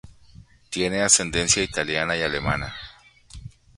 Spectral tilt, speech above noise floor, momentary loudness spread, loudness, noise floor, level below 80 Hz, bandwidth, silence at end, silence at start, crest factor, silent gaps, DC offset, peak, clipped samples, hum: -2 dB/octave; 27 dB; 25 LU; -21 LUFS; -50 dBFS; -44 dBFS; 11.5 kHz; 0.3 s; 0.05 s; 26 dB; none; under 0.1%; 0 dBFS; under 0.1%; none